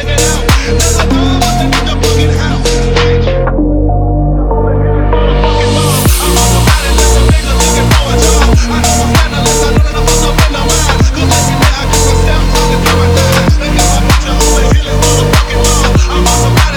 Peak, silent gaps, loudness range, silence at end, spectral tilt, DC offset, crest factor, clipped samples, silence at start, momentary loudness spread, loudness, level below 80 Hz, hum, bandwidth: 0 dBFS; none; 2 LU; 0 s; -4.5 dB/octave; under 0.1%; 8 dB; under 0.1%; 0 s; 3 LU; -9 LUFS; -12 dBFS; none; over 20 kHz